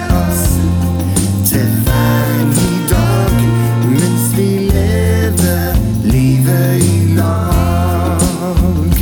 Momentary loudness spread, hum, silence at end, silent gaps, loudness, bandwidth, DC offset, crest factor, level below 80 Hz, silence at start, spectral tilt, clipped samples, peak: 3 LU; none; 0 s; none; -13 LUFS; over 20 kHz; under 0.1%; 12 dB; -20 dBFS; 0 s; -6 dB/octave; under 0.1%; 0 dBFS